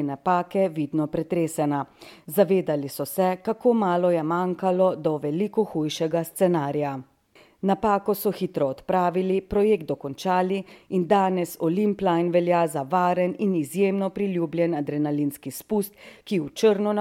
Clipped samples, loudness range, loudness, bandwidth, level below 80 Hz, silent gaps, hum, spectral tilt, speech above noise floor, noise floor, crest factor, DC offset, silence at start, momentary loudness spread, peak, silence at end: under 0.1%; 2 LU; -24 LUFS; 17 kHz; -58 dBFS; none; none; -6.5 dB/octave; 33 dB; -57 dBFS; 18 dB; under 0.1%; 0 s; 7 LU; -6 dBFS; 0 s